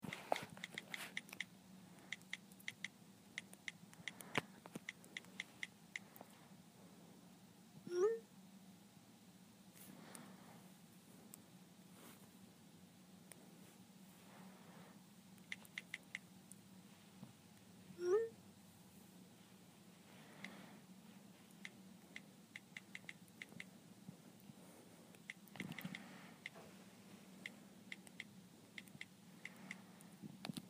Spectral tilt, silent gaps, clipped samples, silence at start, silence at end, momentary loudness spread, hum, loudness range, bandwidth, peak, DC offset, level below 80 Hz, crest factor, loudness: -4 dB/octave; none; under 0.1%; 0 s; 0 s; 18 LU; none; 13 LU; 15.5 kHz; -20 dBFS; under 0.1%; under -90 dBFS; 34 dB; -51 LUFS